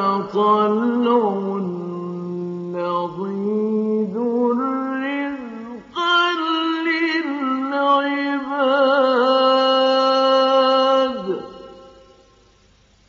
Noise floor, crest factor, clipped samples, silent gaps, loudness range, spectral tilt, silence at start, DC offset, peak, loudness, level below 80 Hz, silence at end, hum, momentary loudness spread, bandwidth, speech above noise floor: -55 dBFS; 14 dB; under 0.1%; none; 6 LU; -2.5 dB/octave; 0 s; under 0.1%; -6 dBFS; -19 LUFS; -64 dBFS; 1.2 s; none; 12 LU; 7.4 kHz; 36 dB